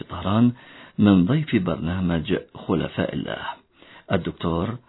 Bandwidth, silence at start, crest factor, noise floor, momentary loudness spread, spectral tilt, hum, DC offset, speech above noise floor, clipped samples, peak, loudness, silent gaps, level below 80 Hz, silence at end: 4.1 kHz; 0 s; 18 dB; -49 dBFS; 13 LU; -11 dB/octave; none; under 0.1%; 27 dB; under 0.1%; -4 dBFS; -23 LUFS; none; -46 dBFS; 0.1 s